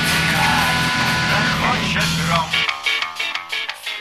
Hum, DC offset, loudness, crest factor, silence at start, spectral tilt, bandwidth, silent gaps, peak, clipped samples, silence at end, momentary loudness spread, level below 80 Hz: none; under 0.1%; -18 LUFS; 16 dB; 0 s; -3 dB/octave; 14 kHz; none; -4 dBFS; under 0.1%; 0 s; 8 LU; -40 dBFS